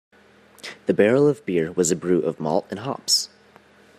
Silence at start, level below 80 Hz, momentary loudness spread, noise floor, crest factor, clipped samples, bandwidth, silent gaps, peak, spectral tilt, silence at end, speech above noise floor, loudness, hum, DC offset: 0.65 s; -66 dBFS; 13 LU; -53 dBFS; 20 dB; under 0.1%; 15.5 kHz; none; -4 dBFS; -4 dB/octave; 0.7 s; 32 dB; -21 LUFS; none; under 0.1%